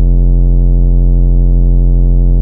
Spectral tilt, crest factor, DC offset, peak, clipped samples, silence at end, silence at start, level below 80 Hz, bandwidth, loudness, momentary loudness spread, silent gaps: -13.5 dB/octave; 6 dB; under 0.1%; 0 dBFS; under 0.1%; 0 s; 0 s; -8 dBFS; 1 kHz; -12 LUFS; 0 LU; none